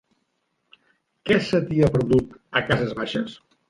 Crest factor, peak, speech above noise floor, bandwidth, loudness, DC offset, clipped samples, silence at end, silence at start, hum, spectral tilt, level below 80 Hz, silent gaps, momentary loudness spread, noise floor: 20 dB; -4 dBFS; 52 dB; 11.5 kHz; -22 LUFS; under 0.1%; under 0.1%; 0.35 s; 1.25 s; none; -7 dB/octave; -48 dBFS; none; 9 LU; -73 dBFS